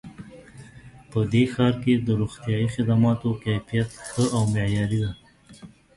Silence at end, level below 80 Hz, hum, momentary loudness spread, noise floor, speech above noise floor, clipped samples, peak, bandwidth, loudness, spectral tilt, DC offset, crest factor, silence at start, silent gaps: 0.3 s; -48 dBFS; none; 10 LU; -47 dBFS; 25 dB; under 0.1%; -6 dBFS; 11.5 kHz; -24 LUFS; -7 dB/octave; under 0.1%; 18 dB; 0.05 s; none